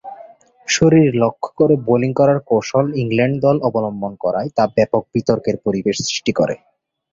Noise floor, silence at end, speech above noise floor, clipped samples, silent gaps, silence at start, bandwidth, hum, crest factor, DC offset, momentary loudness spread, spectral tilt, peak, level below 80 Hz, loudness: -43 dBFS; 0.55 s; 27 dB; under 0.1%; none; 0.05 s; 7.8 kHz; none; 16 dB; under 0.1%; 8 LU; -5.5 dB/octave; -2 dBFS; -52 dBFS; -17 LUFS